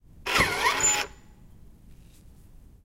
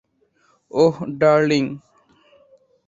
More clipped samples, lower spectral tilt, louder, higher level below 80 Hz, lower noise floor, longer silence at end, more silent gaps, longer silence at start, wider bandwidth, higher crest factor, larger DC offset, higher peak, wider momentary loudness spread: neither; second, -1 dB/octave vs -6.5 dB/octave; second, -24 LUFS vs -19 LUFS; first, -48 dBFS vs -60 dBFS; second, -51 dBFS vs -62 dBFS; second, 0.25 s vs 1.1 s; neither; second, 0.15 s vs 0.75 s; first, 16 kHz vs 7.6 kHz; about the same, 22 dB vs 18 dB; neither; second, -8 dBFS vs -2 dBFS; second, 6 LU vs 12 LU